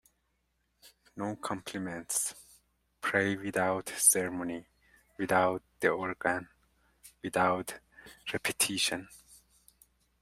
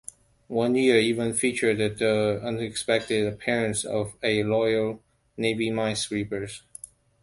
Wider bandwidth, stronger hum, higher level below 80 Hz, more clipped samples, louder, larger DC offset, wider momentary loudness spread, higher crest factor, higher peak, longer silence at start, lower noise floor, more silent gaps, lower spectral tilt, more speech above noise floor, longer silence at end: first, 16 kHz vs 11.5 kHz; neither; second, -70 dBFS vs -58 dBFS; neither; second, -31 LUFS vs -25 LUFS; neither; about the same, 15 LU vs 13 LU; about the same, 24 dB vs 20 dB; second, -10 dBFS vs -6 dBFS; first, 0.85 s vs 0.5 s; first, -77 dBFS vs -47 dBFS; neither; second, -2.5 dB/octave vs -4.5 dB/octave; first, 46 dB vs 22 dB; first, 0.85 s vs 0.65 s